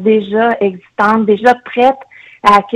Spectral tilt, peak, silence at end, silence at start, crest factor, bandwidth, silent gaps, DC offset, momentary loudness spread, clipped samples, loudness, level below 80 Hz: -6 dB/octave; 0 dBFS; 0 s; 0 s; 12 dB; 12 kHz; none; under 0.1%; 6 LU; 0.3%; -12 LUFS; -50 dBFS